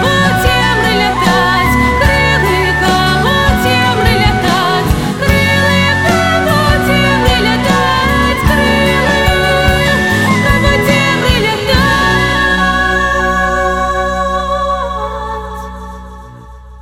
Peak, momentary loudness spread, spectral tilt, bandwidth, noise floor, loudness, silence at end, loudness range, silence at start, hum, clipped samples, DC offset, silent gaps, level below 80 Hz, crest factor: 0 dBFS; 5 LU; -5 dB/octave; 17 kHz; -32 dBFS; -10 LUFS; 0 s; 3 LU; 0 s; none; under 0.1%; 1%; none; -22 dBFS; 12 dB